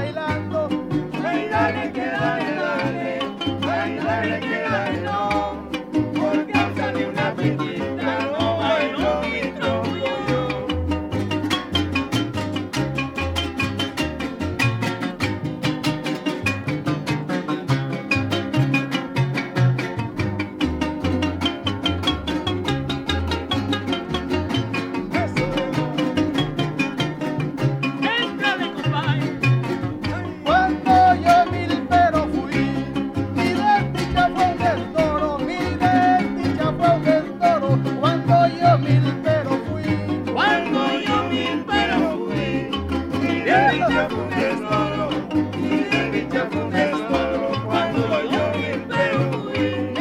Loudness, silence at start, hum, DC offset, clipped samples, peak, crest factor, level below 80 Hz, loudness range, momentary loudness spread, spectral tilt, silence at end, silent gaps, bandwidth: -21 LUFS; 0 s; none; under 0.1%; under 0.1%; -4 dBFS; 18 dB; -42 dBFS; 5 LU; 7 LU; -6.5 dB/octave; 0 s; none; 15.5 kHz